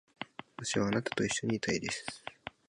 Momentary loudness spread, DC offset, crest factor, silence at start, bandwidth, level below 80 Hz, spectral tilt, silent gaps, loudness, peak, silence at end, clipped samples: 14 LU; under 0.1%; 18 dB; 0.2 s; 11.5 kHz; -64 dBFS; -4 dB/octave; none; -34 LUFS; -16 dBFS; 0.2 s; under 0.1%